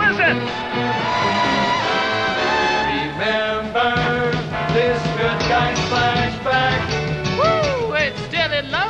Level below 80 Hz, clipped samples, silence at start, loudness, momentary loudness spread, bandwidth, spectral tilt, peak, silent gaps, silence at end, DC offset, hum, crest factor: -40 dBFS; under 0.1%; 0 s; -19 LUFS; 4 LU; 9.4 kHz; -5 dB/octave; -4 dBFS; none; 0 s; under 0.1%; none; 14 dB